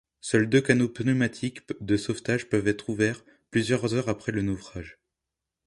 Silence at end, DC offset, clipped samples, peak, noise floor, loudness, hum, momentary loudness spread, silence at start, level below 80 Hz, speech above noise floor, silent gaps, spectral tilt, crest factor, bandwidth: 0.75 s; under 0.1%; under 0.1%; -4 dBFS; -87 dBFS; -26 LUFS; none; 13 LU; 0.25 s; -54 dBFS; 61 dB; none; -6 dB/octave; 22 dB; 11.5 kHz